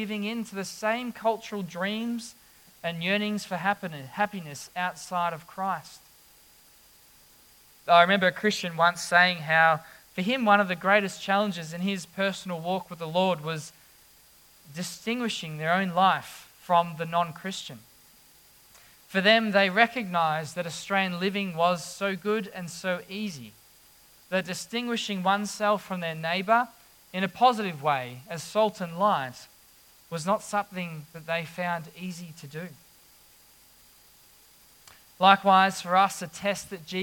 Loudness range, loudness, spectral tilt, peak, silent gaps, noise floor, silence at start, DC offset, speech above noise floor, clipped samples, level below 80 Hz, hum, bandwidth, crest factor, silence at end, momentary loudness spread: 9 LU; -26 LUFS; -4 dB/octave; -4 dBFS; none; -57 dBFS; 0 s; under 0.1%; 30 dB; under 0.1%; -72 dBFS; none; 18 kHz; 24 dB; 0 s; 16 LU